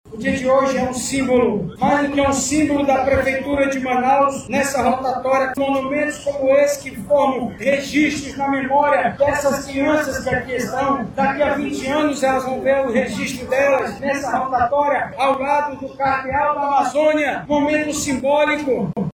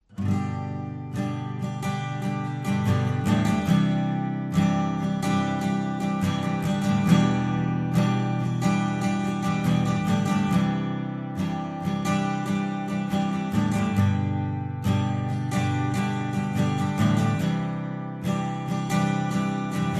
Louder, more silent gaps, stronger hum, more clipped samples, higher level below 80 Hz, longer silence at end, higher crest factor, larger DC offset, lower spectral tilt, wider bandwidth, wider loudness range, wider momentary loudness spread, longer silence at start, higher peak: first, -18 LUFS vs -25 LUFS; neither; neither; neither; first, -44 dBFS vs -54 dBFS; about the same, 0.05 s vs 0 s; about the same, 14 dB vs 18 dB; neither; second, -4.5 dB/octave vs -7 dB/octave; first, 18.5 kHz vs 14 kHz; about the same, 2 LU vs 2 LU; about the same, 5 LU vs 7 LU; about the same, 0.05 s vs 0.1 s; about the same, -4 dBFS vs -6 dBFS